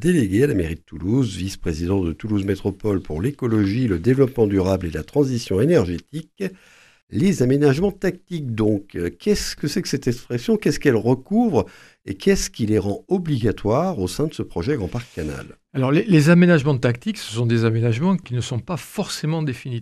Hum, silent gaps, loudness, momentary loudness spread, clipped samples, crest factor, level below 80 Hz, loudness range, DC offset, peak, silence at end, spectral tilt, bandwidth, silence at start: none; 7.03-7.07 s; -21 LUFS; 11 LU; under 0.1%; 18 dB; -42 dBFS; 4 LU; under 0.1%; -2 dBFS; 0 s; -6.5 dB/octave; 14.5 kHz; 0 s